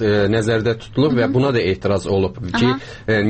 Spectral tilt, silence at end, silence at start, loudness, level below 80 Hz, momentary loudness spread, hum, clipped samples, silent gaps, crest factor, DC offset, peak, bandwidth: -6.5 dB/octave; 0 s; 0 s; -18 LUFS; -42 dBFS; 4 LU; none; under 0.1%; none; 12 dB; under 0.1%; -6 dBFS; 8.8 kHz